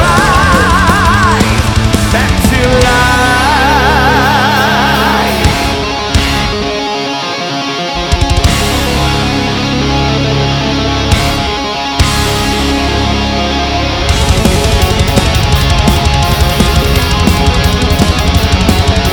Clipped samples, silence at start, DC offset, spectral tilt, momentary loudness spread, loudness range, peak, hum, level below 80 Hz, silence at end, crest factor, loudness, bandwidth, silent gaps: under 0.1%; 0 s; under 0.1%; -4.5 dB/octave; 6 LU; 4 LU; 0 dBFS; none; -16 dBFS; 0 s; 10 dB; -10 LUFS; over 20 kHz; none